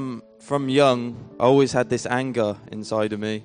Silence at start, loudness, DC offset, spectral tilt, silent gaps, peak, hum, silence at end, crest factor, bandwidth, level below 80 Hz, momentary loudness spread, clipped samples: 0 s; -22 LUFS; under 0.1%; -5.5 dB/octave; none; -4 dBFS; none; 0 s; 18 dB; 10 kHz; -60 dBFS; 15 LU; under 0.1%